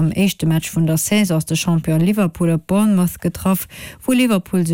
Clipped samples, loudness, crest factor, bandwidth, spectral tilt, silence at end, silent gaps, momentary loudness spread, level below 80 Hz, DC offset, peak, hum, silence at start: under 0.1%; -17 LUFS; 12 dB; 17 kHz; -5.5 dB/octave; 0 s; none; 4 LU; -44 dBFS; under 0.1%; -4 dBFS; none; 0 s